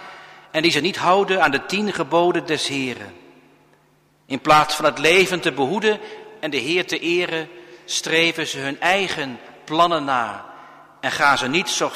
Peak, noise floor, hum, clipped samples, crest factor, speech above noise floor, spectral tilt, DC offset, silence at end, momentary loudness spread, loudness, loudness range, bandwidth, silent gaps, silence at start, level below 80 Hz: -2 dBFS; -58 dBFS; none; under 0.1%; 18 dB; 39 dB; -3 dB/octave; under 0.1%; 0 s; 13 LU; -19 LUFS; 3 LU; 15.5 kHz; none; 0 s; -58 dBFS